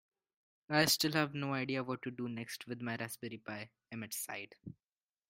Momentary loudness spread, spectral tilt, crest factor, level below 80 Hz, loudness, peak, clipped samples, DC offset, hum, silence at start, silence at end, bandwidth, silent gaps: 17 LU; -3.5 dB/octave; 26 dB; -76 dBFS; -37 LUFS; -14 dBFS; under 0.1%; under 0.1%; none; 0.7 s; 0.55 s; 16 kHz; none